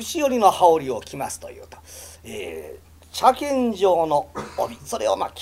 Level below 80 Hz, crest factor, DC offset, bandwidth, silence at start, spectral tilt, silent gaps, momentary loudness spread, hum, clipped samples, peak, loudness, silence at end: -52 dBFS; 20 dB; under 0.1%; 16 kHz; 0 s; -4 dB/octave; none; 21 LU; none; under 0.1%; -2 dBFS; -21 LUFS; 0 s